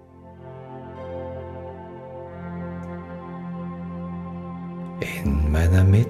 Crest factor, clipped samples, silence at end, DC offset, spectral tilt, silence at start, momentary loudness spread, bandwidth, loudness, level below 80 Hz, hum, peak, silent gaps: 18 dB; under 0.1%; 0 s; under 0.1%; -8 dB/octave; 0 s; 18 LU; 13 kHz; -28 LUFS; -34 dBFS; none; -6 dBFS; none